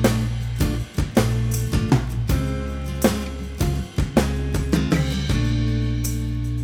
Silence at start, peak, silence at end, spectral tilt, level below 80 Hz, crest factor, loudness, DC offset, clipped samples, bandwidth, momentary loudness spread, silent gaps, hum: 0 s; -2 dBFS; 0 s; -6 dB/octave; -28 dBFS; 20 dB; -23 LUFS; under 0.1%; under 0.1%; 18.5 kHz; 5 LU; none; none